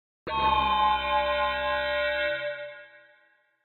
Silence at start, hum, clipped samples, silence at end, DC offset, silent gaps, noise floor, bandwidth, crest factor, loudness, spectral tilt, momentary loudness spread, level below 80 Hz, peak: 0.25 s; none; under 0.1%; 0.7 s; under 0.1%; none; -64 dBFS; 16 kHz; 16 dB; -26 LUFS; -6 dB/octave; 12 LU; -48 dBFS; -12 dBFS